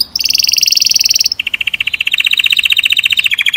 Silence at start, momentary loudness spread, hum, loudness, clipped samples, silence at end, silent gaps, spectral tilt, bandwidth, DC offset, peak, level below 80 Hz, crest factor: 0 s; 6 LU; none; -9 LUFS; 1%; 0 s; none; 3.5 dB/octave; over 20 kHz; under 0.1%; 0 dBFS; -50 dBFS; 12 dB